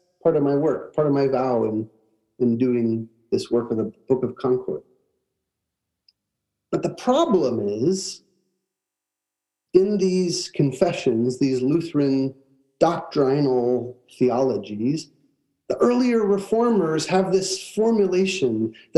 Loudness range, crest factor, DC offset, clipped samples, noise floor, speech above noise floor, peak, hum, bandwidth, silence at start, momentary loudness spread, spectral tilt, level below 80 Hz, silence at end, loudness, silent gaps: 5 LU; 20 dB; under 0.1%; under 0.1%; -85 dBFS; 64 dB; -2 dBFS; none; 12 kHz; 0.25 s; 8 LU; -6 dB/octave; -64 dBFS; 0.25 s; -22 LUFS; none